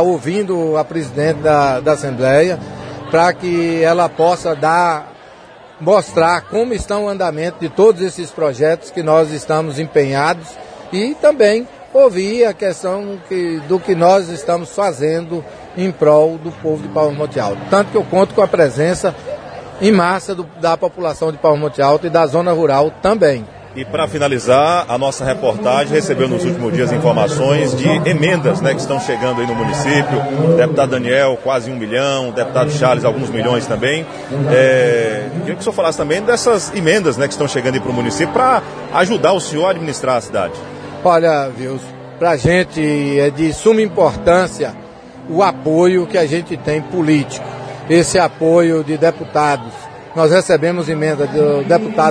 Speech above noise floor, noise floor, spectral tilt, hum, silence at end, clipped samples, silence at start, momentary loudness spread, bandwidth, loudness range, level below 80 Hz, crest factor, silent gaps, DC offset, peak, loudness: 25 dB; -39 dBFS; -5.5 dB/octave; none; 0 s; under 0.1%; 0 s; 9 LU; 10.5 kHz; 2 LU; -46 dBFS; 14 dB; none; under 0.1%; 0 dBFS; -15 LUFS